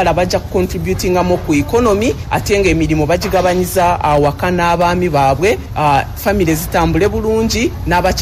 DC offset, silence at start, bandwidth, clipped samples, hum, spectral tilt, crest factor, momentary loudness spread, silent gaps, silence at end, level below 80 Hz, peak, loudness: under 0.1%; 0 s; 16 kHz; under 0.1%; none; -5.5 dB/octave; 12 dB; 4 LU; none; 0 s; -26 dBFS; -2 dBFS; -14 LUFS